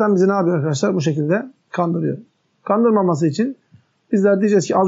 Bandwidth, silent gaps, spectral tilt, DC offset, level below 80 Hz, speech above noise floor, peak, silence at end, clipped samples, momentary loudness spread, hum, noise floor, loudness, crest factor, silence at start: 8 kHz; none; -7 dB/octave; under 0.1%; -72 dBFS; 36 dB; -4 dBFS; 0 s; under 0.1%; 9 LU; none; -53 dBFS; -18 LUFS; 14 dB; 0 s